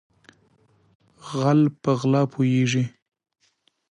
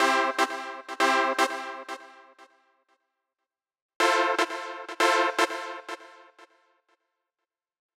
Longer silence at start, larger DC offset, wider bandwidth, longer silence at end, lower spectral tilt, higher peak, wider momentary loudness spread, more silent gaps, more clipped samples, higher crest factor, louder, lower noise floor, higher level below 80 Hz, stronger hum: first, 1.25 s vs 0 s; neither; second, 10 kHz vs 18 kHz; second, 1.05 s vs 1.55 s; first, -7 dB/octave vs 0.5 dB/octave; about the same, -8 dBFS vs -6 dBFS; second, 12 LU vs 16 LU; second, none vs 3.82-3.89 s, 3.96-4.00 s; neither; second, 16 dB vs 22 dB; first, -22 LUFS vs -26 LUFS; second, -67 dBFS vs -88 dBFS; first, -68 dBFS vs under -90 dBFS; neither